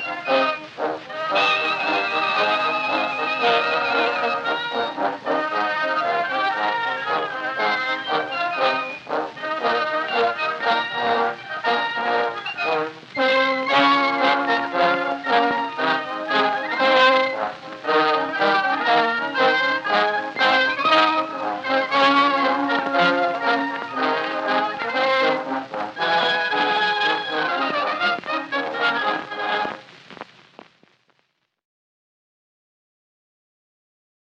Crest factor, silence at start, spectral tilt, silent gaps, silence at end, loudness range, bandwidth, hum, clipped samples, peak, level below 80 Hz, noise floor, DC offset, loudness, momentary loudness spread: 18 dB; 0 s; -3.5 dB/octave; none; 4.1 s; 4 LU; 8.8 kHz; none; under 0.1%; -4 dBFS; -74 dBFS; -70 dBFS; under 0.1%; -20 LUFS; 8 LU